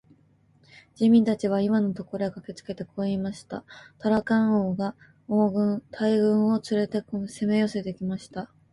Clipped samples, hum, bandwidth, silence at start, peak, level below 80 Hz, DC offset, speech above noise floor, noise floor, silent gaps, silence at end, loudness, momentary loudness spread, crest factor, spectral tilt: under 0.1%; none; 11.5 kHz; 1 s; -10 dBFS; -64 dBFS; under 0.1%; 36 dB; -61 dBFS; none; 0.3 s; -25 LUFS; 15 LU; 16 dB; -7.5 dB/octave